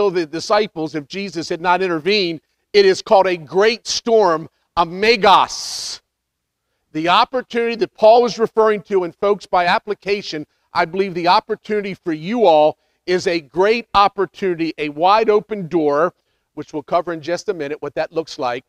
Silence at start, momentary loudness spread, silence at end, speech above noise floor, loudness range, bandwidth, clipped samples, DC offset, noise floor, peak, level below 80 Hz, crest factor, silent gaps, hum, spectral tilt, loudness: 0 s; 12 LU; 0.1 s; 59 dB; 3 LU; 12.5 kHz; under 0.1%; under 0.1%; -76 dBFS; 0 dBFS; -54 dBFS; 18 dB; none; none; -4 dB/octave; -17 LUFS